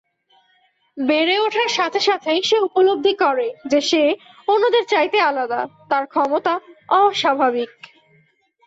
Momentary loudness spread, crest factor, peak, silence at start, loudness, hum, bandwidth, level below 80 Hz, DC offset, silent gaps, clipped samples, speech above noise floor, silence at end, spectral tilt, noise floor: 7 LU; 14 dB; -6 dBFS; 0.95 s; -18 LUFS; none; 8 kHz; -68 dBFS; under 0.1%; none; under 0.1%; 43 dB; 1 s; -2.5 dB/octave; -61 dBFS